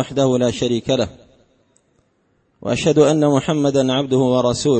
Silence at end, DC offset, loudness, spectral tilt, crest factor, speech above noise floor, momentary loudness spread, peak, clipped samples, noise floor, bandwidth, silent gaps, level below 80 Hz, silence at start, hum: 0 s; under 0.1%; -17 LUFS; -5.5 dB/octave; 16 dB; 46 dB; 7 LU; -2 dBFS; under 0.1%; -63 dBFS; 8.8 kHz; none; -50 dBFS; 0 s; none